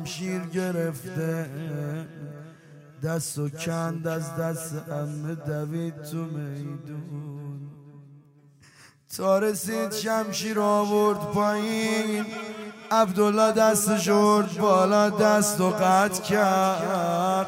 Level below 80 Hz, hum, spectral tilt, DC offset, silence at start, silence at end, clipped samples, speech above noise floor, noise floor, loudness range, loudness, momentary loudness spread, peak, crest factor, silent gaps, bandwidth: -68 dBFS; none; -5 dB/octave; under 0.1%; 0 s; 0 s; under 0.1%; 30 dB; -55 dBFS; 13 LU; -25 LUFS; 16 LU; -8 dBFS; 18 dB; none; 16 kHz